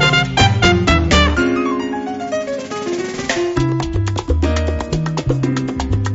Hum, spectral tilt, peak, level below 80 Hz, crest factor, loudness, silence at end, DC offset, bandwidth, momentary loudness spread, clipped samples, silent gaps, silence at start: none; -4.5 dB/octave; 0 dBFS; -26 dBFS; 16 dB; -17 LUFS; 0 s; under 0.1%; 8 kHz; 10 LU; under 0.1%; none; 0 s